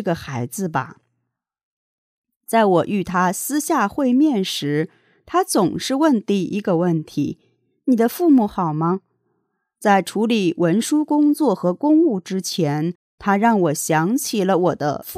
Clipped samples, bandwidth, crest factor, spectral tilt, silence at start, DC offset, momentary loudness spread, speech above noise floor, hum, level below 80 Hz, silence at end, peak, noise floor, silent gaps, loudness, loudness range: under 0.1%; 16 kHz; 16 dB; -5.5 dB/octave; 0 s; under 0.1%; 9 LU; 58 dB; none; -60 dBFS; 0 s; -4 dBFS; -76 dBFS; 1.63-2.22 s, 2.36-2.41 s, 12.95-13.18 s; -19 LUFS; 3 LU